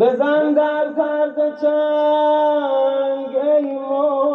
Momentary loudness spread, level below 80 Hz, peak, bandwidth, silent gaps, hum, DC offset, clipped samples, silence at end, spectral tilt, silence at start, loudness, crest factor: 4 LU; -82 dBFS; -4 dBFS; 5.6 kHz; none; none; under 0.1%; under 0.1%; 0 s; -6.5 dB/octave; 0 s; -18 LUFS; 12 dB